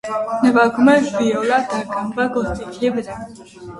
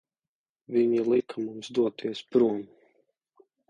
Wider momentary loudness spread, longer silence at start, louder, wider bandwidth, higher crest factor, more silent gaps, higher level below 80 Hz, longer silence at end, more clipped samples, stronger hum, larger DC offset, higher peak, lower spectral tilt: first, 16 LU vs 11 LU; second, 0.05 s vs 0.7 s; first, -18 LUFS vs -27 LUFS; first, 11.5 kHz vs 9 kHz; about the same, 18 dB vs 18 dB; neither; first, -44 dBFS vs -72 dBFS; second, 0 s vs 1.05 s; neither; neither; neither; first, 0 dBFS vs -10 dBFS; about the same, -5.5 dB/octave vs -6.5 dB/octave